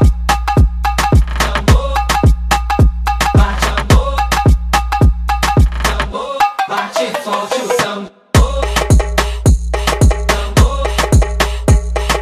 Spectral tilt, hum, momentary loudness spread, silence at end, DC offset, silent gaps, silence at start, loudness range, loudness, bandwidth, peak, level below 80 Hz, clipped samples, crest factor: -5 dB/octave; none; 4 LU; 0 s; under 0.1%; none; 0 s; 2 LU; -14 LUFS; 15.5 kHz; 0 dBFS; -16 dBFS; under 0.1%; 12 dB